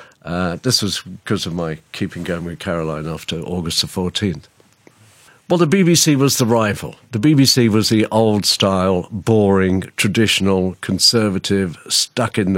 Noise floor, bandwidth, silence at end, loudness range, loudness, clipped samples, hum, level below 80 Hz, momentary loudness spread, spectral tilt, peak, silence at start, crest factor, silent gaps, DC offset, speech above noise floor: -51 dBFS; 16.5 kHz; 0 s; 8 LU; -17 LUFS; under 0.1%; none; -48 dBFS; 12 LU; -4.5 dB/octave; -2 dBFS; 0 s; 16 dB; none; under 0.1%; 34 dB